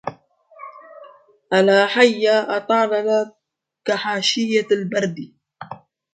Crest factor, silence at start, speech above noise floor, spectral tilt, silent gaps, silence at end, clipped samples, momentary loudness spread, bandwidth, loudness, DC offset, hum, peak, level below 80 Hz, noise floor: 20 dB; 0.05 s; 46 dB; -4 dB/octave; none; 0.4 s; under 0.1%; 24 LU; 9.2 kHz; -18 LUFS; under 0.1%; none; 0 dBFS; -70 dBFS; -63 dBFS